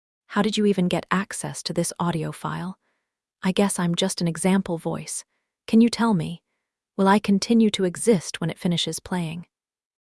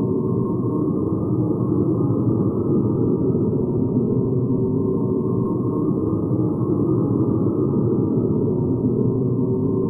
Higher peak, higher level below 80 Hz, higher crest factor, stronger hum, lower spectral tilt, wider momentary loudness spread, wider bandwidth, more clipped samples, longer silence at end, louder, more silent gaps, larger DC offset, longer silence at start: first, -4 dBFS vs -8 dBFS; second, -60 dBFS vs -44 dBFS; first, 20 dB vs 12 dB; neither; second, -5 dB/octave vs -14.5 dB/octave; first, 12 LU vs 2 LU; first, 12 kHz vs 1.5 kHz; neither; first, 0.7 s vs 0 s; about the same, -23 LUFS vs -21 LUFS; neither; neither; first, 0.3 s vs 0 s